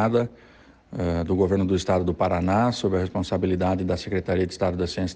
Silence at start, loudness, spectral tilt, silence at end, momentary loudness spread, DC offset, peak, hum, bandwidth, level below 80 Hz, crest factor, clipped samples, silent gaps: 0 s; -24 LUFS; -7 dB/octave; 0 s; 5 LU; under 0.1%; -8 dBFS; none; 9.4 kHz; -46 dBFS; 14 dB; under 0.1%; none